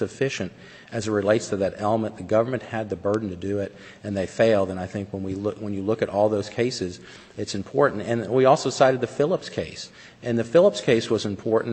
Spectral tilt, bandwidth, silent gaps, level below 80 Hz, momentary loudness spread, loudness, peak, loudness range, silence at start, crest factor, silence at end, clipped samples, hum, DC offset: -5.5 dB/octave; 8.6 kHz; none; -60 dBFS; 14 LU; -24 LUFS; -4 dBFS; 4 LU; 0 s; 20 dB; 0 s; under 0.1%; none; under 0.1%